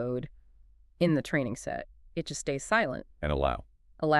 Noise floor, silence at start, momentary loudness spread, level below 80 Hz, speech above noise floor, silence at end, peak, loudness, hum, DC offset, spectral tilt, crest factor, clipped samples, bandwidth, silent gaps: -58 dBFS; 0 s; 12 LU; -46 dBFS; 28 dB; 0 s; -12 dBFS; -31 LUFS; none; under 0.1%; -5.5 dB/octave; 20 dB; under 0.1%; 12.5 kHz; none